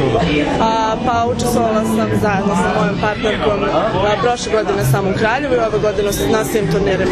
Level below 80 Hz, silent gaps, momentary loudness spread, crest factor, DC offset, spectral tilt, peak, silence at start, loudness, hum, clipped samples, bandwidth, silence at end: -34 dBFS; none; 2 LU; 14 dB; under 0.1%; -5.5 dB/octave; -2 dBFS; 0 s; -16 LUFS; none; under 0.1%; 14 kHz; 0 s